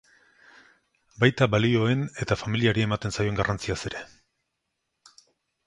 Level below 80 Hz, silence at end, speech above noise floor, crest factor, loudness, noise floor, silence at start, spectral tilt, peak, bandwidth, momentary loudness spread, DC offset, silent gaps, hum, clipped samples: -50 dBFS; 1.6 s; 55 dB; 22 dB; -25 LUFS; -80 dBFS; 1.2 s; -6 dB/octave; -4 dBFS; 11 kHz; 9 LU; under 0.1%; none; none; under 0.1%